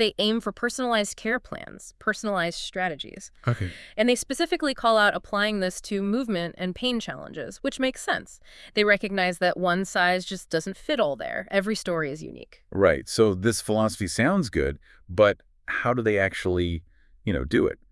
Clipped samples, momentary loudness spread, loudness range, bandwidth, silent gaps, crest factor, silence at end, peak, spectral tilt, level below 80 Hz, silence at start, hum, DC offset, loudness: under 0.1%; 11 LU; 4 LU; 12 kHz; none; 20 dB; 0.15 s; -6 dBFS; -4.5 dB/octave; -48 dBFS; 0 s; none; under 0.1%; -25 LUFS